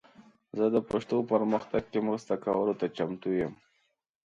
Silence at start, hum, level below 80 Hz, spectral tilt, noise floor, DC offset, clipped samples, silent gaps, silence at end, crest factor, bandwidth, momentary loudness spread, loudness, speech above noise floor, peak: 0.2 s; none; -64 dBFS; -7.5 dB/octave; -75 dBFS; under 0.1%; under 0.1%; none; 0.7 s; 18 dB; 8 kHz; 5 LU; -30 LUFS; 46 dB; -12 dBFS